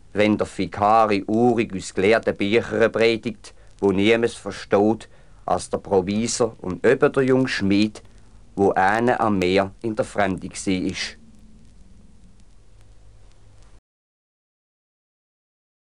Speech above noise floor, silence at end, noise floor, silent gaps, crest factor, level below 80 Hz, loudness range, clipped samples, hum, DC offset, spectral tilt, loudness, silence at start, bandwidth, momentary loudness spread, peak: 30 dB; 4.75 s; -50 dBFS; none; 20 dB; -52 dBFS; 8 LU; under 0.1%; none; 0.4%; -5 dB/octave; -21 LUFS; 0.15 s; 11.5 kHz; 9 LU; -4 dBFS